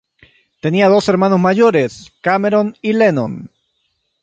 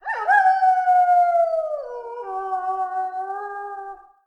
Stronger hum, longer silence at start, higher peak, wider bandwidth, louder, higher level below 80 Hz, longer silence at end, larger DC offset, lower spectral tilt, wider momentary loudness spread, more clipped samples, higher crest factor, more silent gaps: neither; first, 0.65 s vs 0.05 s; first, -2 dBFS vs -6 dBFS; first, 9 kHz vs 6.2 kHz; first, -14 LUFS vs -20 LUFS; first, -56 dBFS vs -66 dBFS; first, 0.75 s vs 0.3 s; neither; first, -7 dB/octave vs -2.5 dB/octave; second, 11 LU vs 16 LU; neither; about the same, 14 dB vs 16 dB; neither